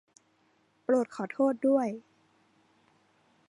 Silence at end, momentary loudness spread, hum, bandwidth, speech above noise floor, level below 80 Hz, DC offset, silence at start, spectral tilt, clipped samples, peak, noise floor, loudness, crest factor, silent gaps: 1.5 s; 12 LU; none; 10.5 kHz; 41 dB; -86 dBFS; under 0.1%; 0.9 s; -7 dB/octave; under 0.1%; -14 dBFS; -69 dBFS; -29 LUFS; 18 dB; none